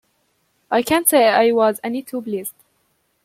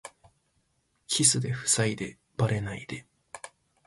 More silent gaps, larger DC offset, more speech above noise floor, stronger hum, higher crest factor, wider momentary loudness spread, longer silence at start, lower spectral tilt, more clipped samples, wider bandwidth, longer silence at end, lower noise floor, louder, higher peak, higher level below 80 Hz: neither; neither; first, 49 dB vs 45 dB; neither; second, 18 dB vs 24 dB; second, 13 LU vs 23 LU; first, 0.7 s vs 0.05 s; about the same, -3 dB/octave vs -3 dB/octave; neither; first, 16.5 kHz vs 12 kHz; first, 0.75 s vs 0.4 s; second, -66 dBFS vs -73 dBFS; first, -17 LUFS vs -26 LUFS; first, 0 dBFS vs -8 dBFS; about the same, -62 dBFS vs -58 dBFS